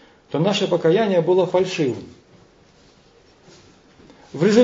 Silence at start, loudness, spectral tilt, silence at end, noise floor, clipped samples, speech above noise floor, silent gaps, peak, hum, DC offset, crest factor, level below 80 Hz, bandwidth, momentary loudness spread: 0.3 s; -19 LUFS; -6 dB/octave; 0 s; -53 dBFS; under 0.1%; 35 dB; none; -2 dBFS; none; under 0.1%; 18 dB; -64 dBFS; 7.8 kHz; 11 LU